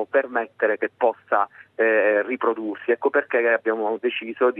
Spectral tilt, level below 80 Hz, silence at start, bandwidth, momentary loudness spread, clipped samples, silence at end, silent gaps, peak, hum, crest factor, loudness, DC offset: -7 dB/octave; -84 dBFS; 0 s; 3.9 kHz; 6 LU; under 0.1%; 0 s; none; -6 dBFS; none; 16 dB; -22 LUFS; under 0.1%